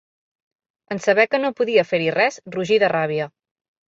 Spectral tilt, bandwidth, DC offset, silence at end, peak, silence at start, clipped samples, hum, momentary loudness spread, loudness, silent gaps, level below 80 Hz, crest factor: -5 dB/octave; 7.8 kHz; under 0.1%; 0.6 s; -4 dBFS; 0.9 s; under 0.1%; none; 10 LU; -19 LUFS; none; -66 dBFS; 18 dB